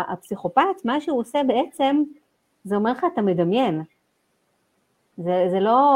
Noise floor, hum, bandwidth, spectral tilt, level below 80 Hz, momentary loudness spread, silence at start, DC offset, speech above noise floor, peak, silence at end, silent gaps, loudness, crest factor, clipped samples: -69 dBFS; none; 15.5 kHz; -7 dB/octave; -66 dBFS; 9 LU; 0 s; under 0.1%; 48 dB; -4 dBFS; 0 s; none; -22 LUFS; 18 dB; under 0.1%